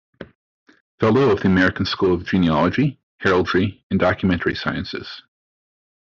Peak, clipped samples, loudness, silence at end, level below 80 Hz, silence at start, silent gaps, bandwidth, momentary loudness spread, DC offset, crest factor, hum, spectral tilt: -4 dBFS; under 0.1%; -19 LUFS; 0.8 s; -50 dBFS; 0.2 s; 0.35-0.66 s, 0.80-0.98 s, 3.03-3.18 s, 3.83-3.90 s; 7.2 kHz; 10 LU; under 0.1%; 16 dB; none; -5 dB/octave